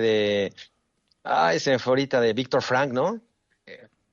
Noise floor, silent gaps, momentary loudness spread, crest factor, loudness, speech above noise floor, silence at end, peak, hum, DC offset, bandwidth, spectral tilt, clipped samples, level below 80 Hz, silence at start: -70 dBFS; none; 8 LU; 14 dB; -23 LUFS; 47 dB; 0.35 s; -10 dBFS; none; under 0.1%; 7.4 kHz; -5 dB/octave; under 0.1%; -68 dBFS; 0 s